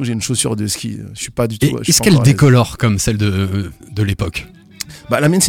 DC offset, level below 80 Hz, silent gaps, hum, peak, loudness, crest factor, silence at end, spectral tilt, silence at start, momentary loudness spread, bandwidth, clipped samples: under 0.1%; -38 dBFS; none; none; 0 dBFS; -15 LUFS; 14 dB; 0 s; -5 dB/octave; 0 s; 16 LU; 18.5 kHz; under 0.1%